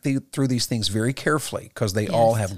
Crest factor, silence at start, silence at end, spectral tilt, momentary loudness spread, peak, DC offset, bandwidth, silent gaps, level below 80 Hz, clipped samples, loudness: 16 dB; 0 s; 0 s; -5 dB/octave; 6 LU; -8 dBFS; 0.5%; 15.5 kHz; none; -56 dBFS; under 0.1%; -23 LUFS